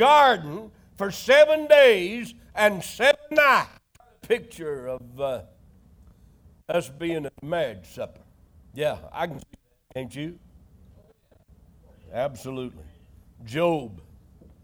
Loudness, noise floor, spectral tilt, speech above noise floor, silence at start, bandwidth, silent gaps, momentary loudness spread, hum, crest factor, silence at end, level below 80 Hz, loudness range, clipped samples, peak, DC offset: -23 LUFS; -58 dBFS; -4 dB/octave; 36 dB; 0 s; over 20 kHz; none; 21 LU; none; 20 dB; 0.65 s; -56 dBFS; 17 LU; under 0.1%; -6 dBFS; under 0.1%